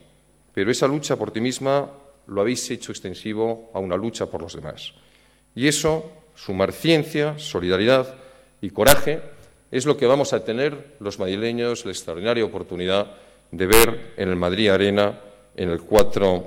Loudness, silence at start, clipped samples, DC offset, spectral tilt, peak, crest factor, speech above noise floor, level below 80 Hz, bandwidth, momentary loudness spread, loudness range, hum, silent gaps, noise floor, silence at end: -22 LUFS; 0 s; under 0.1%; under 0.1%; -4 dB/octave; 0 dBFS; 22 dB; 36 dB; -42 dBFS; over 20 kHz; 16 LU; 6 LU; none; none; -57 dBFS; 0 s